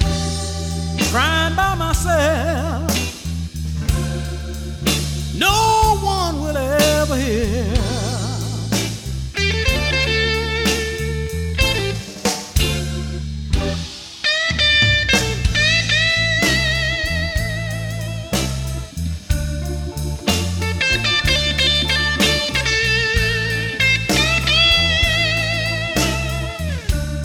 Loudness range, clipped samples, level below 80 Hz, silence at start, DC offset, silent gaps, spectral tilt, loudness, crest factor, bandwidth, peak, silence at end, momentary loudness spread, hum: 6 LU; under 0.1%; -26 dBFS; 0 s; under 0.1%; none; -3.5 dB/octave; -18 LUFS; 18 dB; 18.5 kHz; -2 dBFS; 0 s; 11 LU; none